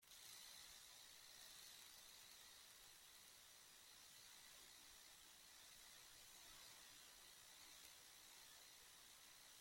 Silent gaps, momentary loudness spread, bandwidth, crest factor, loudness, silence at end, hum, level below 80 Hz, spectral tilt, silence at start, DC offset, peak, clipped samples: none; 4 LU; 16.5 kHz; 22 dB; -62 LUFS; 0 s; none; -86 dBFS; 0.5 dB/octave; 0 s; under 0.1%; -44 dBFS; under 0.1%